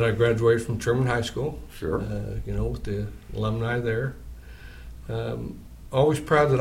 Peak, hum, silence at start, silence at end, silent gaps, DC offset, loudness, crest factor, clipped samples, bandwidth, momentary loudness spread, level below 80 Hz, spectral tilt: -8 dBFS; none; 0 s; 0 s; none; under 0.1%; -26 LUFS; 18 dB; under 0.1%; 16 kHz; 22 LU; -40 dBFS; -6.5 dB/octave